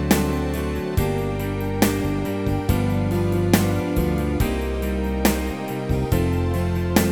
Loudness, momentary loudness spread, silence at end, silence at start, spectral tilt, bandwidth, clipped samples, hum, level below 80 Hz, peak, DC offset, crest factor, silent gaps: -22 LUFS; 5 LU; 0 s; 0 s; -6 dB/octave; over 20 kHz; under 0.1%; none; -30 dBFS; -2 dBFS; 0.3%; 20 dB; none